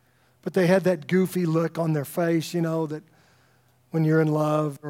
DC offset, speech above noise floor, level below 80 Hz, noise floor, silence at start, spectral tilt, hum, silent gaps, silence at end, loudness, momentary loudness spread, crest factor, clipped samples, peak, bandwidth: under 0.1%; 38 dB; -74 dBFS; -62 dBFS; 0.45 s; -7 dB/octave; none; none; 0 s; -24 LUFS; 9 LU; 18 dB; under 0.1%; -6 dBFS; 16.5 kHz